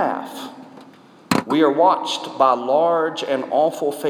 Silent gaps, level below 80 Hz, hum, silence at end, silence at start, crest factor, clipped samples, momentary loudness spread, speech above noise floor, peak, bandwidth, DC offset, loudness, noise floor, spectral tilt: none; -70 dBFS; none; 0 s; 0 s; 18 dB; under 0.1%; 12 LU; 27 dB; -2 dBFS; 18.5 kHz; under 0.1%; -19 LUFS; -46 dBFS; -4.5 dB/octave